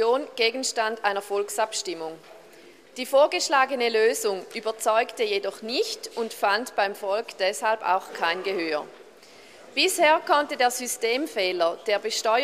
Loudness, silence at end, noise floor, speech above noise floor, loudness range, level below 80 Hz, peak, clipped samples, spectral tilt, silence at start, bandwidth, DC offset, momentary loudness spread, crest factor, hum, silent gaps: -24 LUFS; 0 s; -50 dBFS; 26 dB; 3 LU; -76 dBFS; -6 dBFS; under 0.1%; -1 dB/octave; 0 s; 15 kHz; under 0.1%; 10 LU; 18 dB; none; none